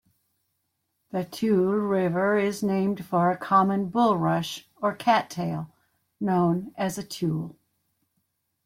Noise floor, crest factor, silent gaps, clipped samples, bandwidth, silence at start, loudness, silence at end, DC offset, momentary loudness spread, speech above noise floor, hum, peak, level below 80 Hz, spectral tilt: -77 dBFS; 18 dB; none; under 0.1%; 16 kHz; 1.15 s; -25 LUFS; 1.15 s; under 0.1%; 11 LU; 53 dB; none; -8 dBFS; -66 dBFS; -6.5 dB/octave